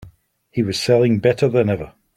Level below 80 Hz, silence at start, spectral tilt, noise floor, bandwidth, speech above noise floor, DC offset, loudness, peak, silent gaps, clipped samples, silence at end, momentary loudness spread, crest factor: -50 dBFS; 0 s; -6.5 dB/octave; -50 dBFS; 14 kHz; 34 dB; under 0.1%; -18 LUFS; -2 dBFS; none; under 0.1%; 0.25 s; 9 LU; 16 dB